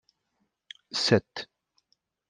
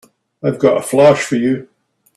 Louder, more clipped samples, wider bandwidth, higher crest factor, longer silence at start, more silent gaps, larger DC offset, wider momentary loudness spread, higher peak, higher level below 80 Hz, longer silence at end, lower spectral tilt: second, -26 LUFS vs -14 LUFS; neither; second, 11 kHz vs 13 kHz; first, 26 dB vs 16 dB; first, 0.95 s vs 0.45 s; neither; neither; first, 25 LU vs 11 LU; second, -6 dBFS vs 0 dBFS; second, -70 dBFS vs -58 dBFS; first, 0.85 s vs 0.5 s; about the same, -4.5 dB/octave vs -5.5 dB/octave